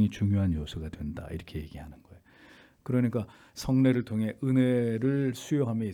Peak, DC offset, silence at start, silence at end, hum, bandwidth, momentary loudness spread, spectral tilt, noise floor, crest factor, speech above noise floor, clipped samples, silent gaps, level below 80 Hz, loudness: -12 dBFS; under 0.1%; 0 s; 0 s; none; 15.5 kHz; 16 LU; -7.5 dB/octave; -56 dBFS; 16 dB; 28 dB; under 0.1%; none; -50 dBFS; -29 LUFS